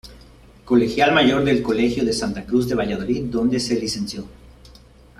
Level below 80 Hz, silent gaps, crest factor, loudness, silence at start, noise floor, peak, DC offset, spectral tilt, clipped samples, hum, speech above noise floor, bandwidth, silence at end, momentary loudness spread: -44 dBFS; none; 18 dB; -20 LUFS; 0.05 s; -47 dBFS; -4 dBFS; under 0.1%; -5 dB/octave; under 0.1%; none; 28 dB; 13.5 kHz; 0.5 s; 10 LU